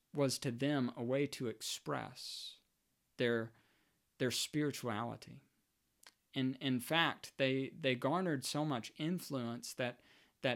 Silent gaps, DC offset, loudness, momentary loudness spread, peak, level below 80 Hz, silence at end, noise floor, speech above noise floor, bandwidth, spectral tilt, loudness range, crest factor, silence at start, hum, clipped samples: none; under 0.1%; -38 LUFS; 10 LU; -16 dBFS; -82 dBFS; 0 s; -81 dBFS; 43 dB; 17 kHz; -4.5 dB/octave; 4 LU; 22 dB; 0.15 s; none; under 0.1%